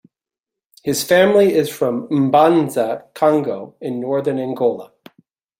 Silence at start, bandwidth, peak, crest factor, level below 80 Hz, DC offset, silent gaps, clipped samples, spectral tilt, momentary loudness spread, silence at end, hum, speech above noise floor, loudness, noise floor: 0.85 s; 16.5 kHz; -2 dBFS; 16 dB; -62 dBFS; under 0.1%; none; under 0.1%; -5.5 dB/octave; 13 LU; 0.75 s; none; 70 dB; -17 LUFS; -86 dBFS